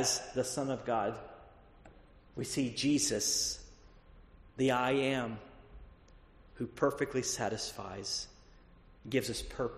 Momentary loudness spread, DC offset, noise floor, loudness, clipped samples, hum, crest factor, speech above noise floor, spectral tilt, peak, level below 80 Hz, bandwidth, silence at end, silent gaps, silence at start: 18 LU; under 0.1%; -59 dBFS; -34 LUFS; under 0.1%; none; 22 dB; 25 dB; -3 dB/octave; -14 dBFS; -58 dBFS; 13 kHz; 0 s; none; 0 s